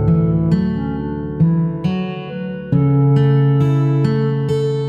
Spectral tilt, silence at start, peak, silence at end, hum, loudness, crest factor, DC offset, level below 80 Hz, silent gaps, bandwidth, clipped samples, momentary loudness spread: -10 dB/octave; 0 s; -4 dBFS; 0 s; none; -17 LUFS; 12 dB; under 0.1%; -38 dBFS; none; 5.4 kHz; under 0.1%; 10 LU